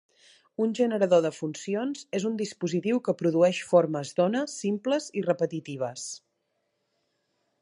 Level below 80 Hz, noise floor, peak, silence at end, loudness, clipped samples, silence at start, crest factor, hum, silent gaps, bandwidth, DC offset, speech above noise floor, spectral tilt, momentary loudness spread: -78 dBFS; -77 dBFS; -8 dBFS; 1.45 s; -27 LUFS; under 0.1%; 0.6 s; 20 dB; none; none; 11.5 kHz; under 0.1%; 51 dB; -5.5 dB/octave; 10 LU